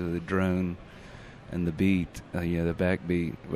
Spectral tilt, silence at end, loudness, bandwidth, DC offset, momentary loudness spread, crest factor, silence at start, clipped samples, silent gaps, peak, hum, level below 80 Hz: -8 dB/octave; 0 s; -29 LUFS; 14 kHz; under 0.1%; 20 LU; 16 dB; 0 s; under 0.1%; none; -12 dBFS; none; -48 dBFS